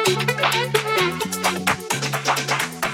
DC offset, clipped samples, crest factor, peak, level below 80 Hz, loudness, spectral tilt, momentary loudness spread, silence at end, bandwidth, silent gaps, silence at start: under 0.1%; under 0.1%; 18 dB; -4 dBFS; -56 dBFS; -21 LUFS; -3 dB/octave; 4 LU; 0 s; 19 kHz; none; 0 s